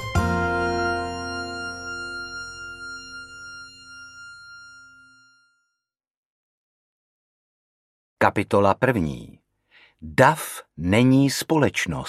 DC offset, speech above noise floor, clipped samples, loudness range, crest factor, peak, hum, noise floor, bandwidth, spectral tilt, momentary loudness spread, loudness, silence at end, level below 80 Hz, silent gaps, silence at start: under 0.1%; 62 dB; under 0.1%; 21 LU; 24 dB; 0 dBFS; none; -83 dBFS; 15.5 kHz; -5.5 dB/octave; 23 LU; -22 LUFS; 0 s; -46 dBFS; 6.17-8.17 s; 0 s